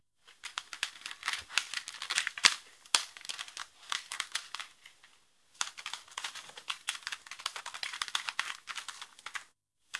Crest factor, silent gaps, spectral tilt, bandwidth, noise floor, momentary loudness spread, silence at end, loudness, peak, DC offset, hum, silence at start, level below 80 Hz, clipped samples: 38 dB; none; 3 dB/octave; 12 kHz; -69 dBFS; 13 LU; 0 s; -35 LUFS; 0 dBFS; under 0.1%; none; 0.25 s; -80 dBFS; under 0.1%